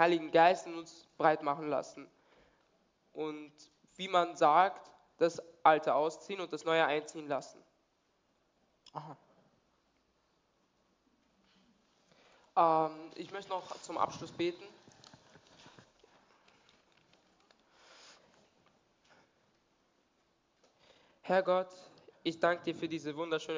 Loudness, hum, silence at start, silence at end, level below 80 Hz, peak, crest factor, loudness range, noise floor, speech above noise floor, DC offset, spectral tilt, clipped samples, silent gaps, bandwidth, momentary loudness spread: -33 LUFS; none; 0 s; 0 s; -82 dBFS; -10 dBFS; 26 dB; 17 LU; -76 dBFS; 44 dB; under 0.1%; -4.5 dB/octave; under 0.1%; none; 7.6 kHz; 21 LU